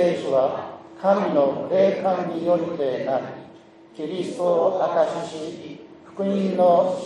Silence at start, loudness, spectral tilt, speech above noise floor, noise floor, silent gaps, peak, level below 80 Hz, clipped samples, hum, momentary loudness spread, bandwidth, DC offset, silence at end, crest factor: 0 s; -22 LUFS; -7 dB/octave; 26 dB; -47 dBFS; none; -6 dBFS; -72 dBFS; under 0.1%; none; 17 LU; 10.5 kHz; under 0.1%; 0 s; 16 dB